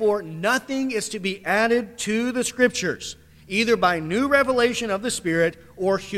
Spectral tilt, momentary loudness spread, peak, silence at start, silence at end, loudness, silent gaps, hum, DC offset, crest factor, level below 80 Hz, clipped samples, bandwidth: -3.5 dB/octave; 8 LU; -6 dBFS; 0 s; 0 s; -22 LUFS; none; none; under 0.1%; 16 dB; -54 dBFS; under 0.1%; 15.5 kHz